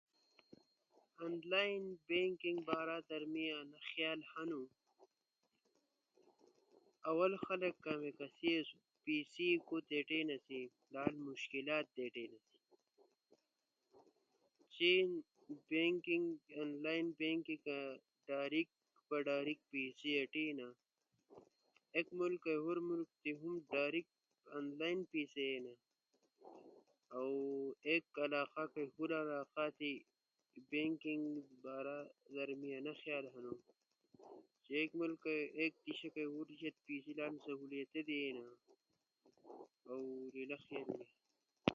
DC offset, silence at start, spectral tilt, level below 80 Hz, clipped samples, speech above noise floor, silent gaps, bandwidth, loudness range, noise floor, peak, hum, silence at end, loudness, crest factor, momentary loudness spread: under 0.1%; 1.2 s; -2.5 dB/octave; -86 dBFS; under 0.1%; 46 dB; none; 7.2 kHz; 8 LU; -88 dBFS; -16 dBFS; none; 0 s; -42 LUFS; 28 dB; 13 LU